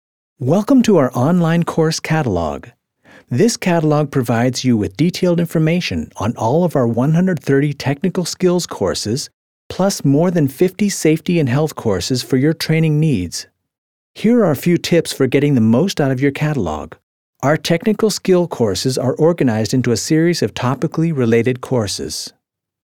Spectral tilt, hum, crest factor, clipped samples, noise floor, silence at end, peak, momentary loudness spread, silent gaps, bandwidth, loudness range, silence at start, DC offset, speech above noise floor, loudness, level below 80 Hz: -6 dB/octave; none; 16 dB; under 0.1%; -48 dBFS; 0.55 s; 0 dBFS; 7 LU; 9.34-9.70 s, 13.78-14.14 s, 17.03-17.33 s; 18.5 kHz; 2 LU; 0.4 s; under 0.1%; 32 dB; -16 LUFS; -48 dBFS